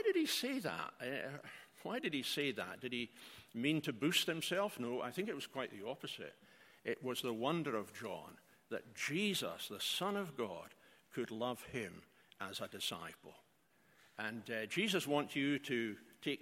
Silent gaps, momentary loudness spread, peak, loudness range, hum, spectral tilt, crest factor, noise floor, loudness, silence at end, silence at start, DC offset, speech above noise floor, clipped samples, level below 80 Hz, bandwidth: none; 14 LU; -20 dBFS; 6 LU; none; -4 dB/octave; 22 dB; -73 dBFS; -40 LUFS; 0 s; 0 s; under 0.1%; 32 dB; under 0.1%; -82 dBFS; 16.5 kHz